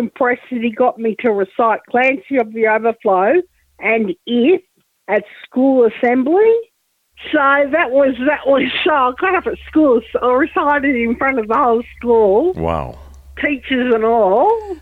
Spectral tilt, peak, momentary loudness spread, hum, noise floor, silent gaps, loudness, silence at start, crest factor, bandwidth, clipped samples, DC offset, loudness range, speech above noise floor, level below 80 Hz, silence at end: -7.5 dB/octave; -2 dBFS; 7 LU; none; -56 dBFS; none; -15 LUFS; 0 s; 12 dB; 4.5 kHz; under 0.1%; under 0.1%; 2 LU; 41 dB; -44 dBFS; 0 s